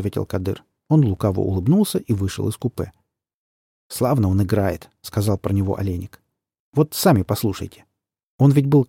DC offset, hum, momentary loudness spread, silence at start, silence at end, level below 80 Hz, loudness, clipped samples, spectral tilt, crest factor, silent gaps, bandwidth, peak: under 0.1%; none; 14 LU; 0 s; 0.05 s; -48 dBFS; -20 LUFS; under 0.1%; -7 dB/octave; 18 dB; 3.34-3.90 s, 6.59-6.73 s, 8.23-8.39 s; 17 kHz; -2 dBFS